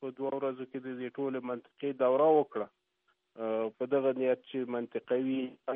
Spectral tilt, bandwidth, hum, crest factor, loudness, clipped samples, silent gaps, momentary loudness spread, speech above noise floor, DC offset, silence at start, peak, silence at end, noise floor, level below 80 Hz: -5 dB/octave; 3.8 kHz; none; 18 dB; -32 LUFS; under 0.1%; none; 13 LU; 45 dB; under 0.1%; 0 s; -14 dBFS; 0 s; -77 dBFS; -88 dBFS